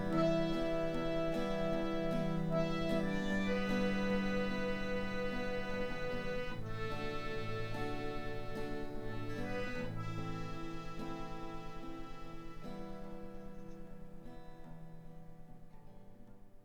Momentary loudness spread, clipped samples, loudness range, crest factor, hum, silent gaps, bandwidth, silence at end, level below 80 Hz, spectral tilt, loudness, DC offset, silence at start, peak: 19 LU; under 0.1%; 15 LU; 16 dB; none; none; 10.5 kHz; 0.05 s; -48 dBFS; -6.5 dB/octave; -39 LUFS; under 0.1%; 0 s; -22 dBFS